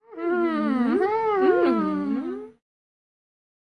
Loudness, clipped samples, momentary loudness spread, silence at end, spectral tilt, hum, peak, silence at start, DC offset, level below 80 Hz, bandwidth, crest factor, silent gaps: -23 LUFS; under 0.1%; 9 LU; 1.1 s; -8 dB/octave; none; -10 dBFS; 0.1 s; under 0.1%; -70 dBFS; 9 kHz; 14 dB; none